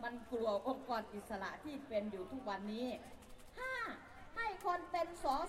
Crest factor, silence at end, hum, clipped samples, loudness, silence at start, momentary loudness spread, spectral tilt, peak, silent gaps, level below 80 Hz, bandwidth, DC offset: 16 dB; 0 s; none; under 0.1%; -42 LUFS; 0 s; 11 LU; -5 dB/octave; -26 dBFS; none; -62 dBFS; 16 kHz; under 0.1%